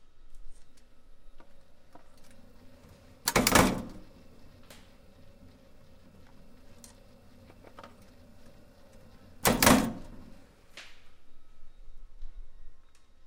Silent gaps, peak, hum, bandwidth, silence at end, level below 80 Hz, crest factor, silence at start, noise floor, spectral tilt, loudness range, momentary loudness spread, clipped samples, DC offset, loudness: none; -4 dBFS; none; 16.5 kHz; 0 s; -48 dBFS; 30 dB; 0 s; -54 dBFS; -3.5 dB/octave; 7 LU; 31 LU; under 0.1%; under 0.1%; -25 LUFS